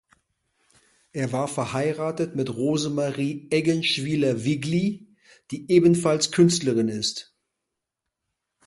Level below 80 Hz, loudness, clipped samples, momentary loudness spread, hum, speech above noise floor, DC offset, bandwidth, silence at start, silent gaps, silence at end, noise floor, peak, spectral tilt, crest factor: -64 dBFS; -23 LUFS; under 0.1%; 10 LU; none; 61 dB; under 0.1%; 11.5 kHz; 1.15 s; none; 1.45 s; -84 dBFS; -6 dBFS; -5 dB/octave; 20 dB